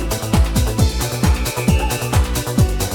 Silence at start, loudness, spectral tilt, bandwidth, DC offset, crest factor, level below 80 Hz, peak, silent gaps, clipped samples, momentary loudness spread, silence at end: 0 s; -18 LUFS; -5 dB/octave; 19.5 kHz; under 0.1%; 14 dB; -22 dBFS; -2 dBFS; none; under 0.1%; 2 LU; 0 s